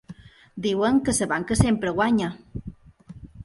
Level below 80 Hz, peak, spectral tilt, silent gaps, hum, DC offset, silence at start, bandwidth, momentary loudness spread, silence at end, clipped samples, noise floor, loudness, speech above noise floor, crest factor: -42 dBFS; -4 dBFS; -5 dB/octave; none; none; under 0.1%; 0.1 s; 11.5 kHz; 19 LU; 0 s; under 0.1%; -46 dBFS; -23 LUFS; 24 dB; 20 dB